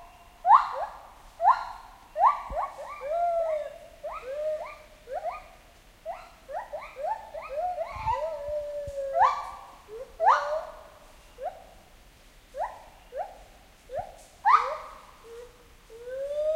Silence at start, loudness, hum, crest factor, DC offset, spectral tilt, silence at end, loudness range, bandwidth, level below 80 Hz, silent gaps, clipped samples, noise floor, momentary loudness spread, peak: 0 s; -28 LUFS; none; 24 dB; under 0.1%; -3.5 dB/octave; 0 s; 9 LU; 16 kHz; -54 dBFS; none; under 0.1%; -54 dBFS; 22 LU; -6 dBFS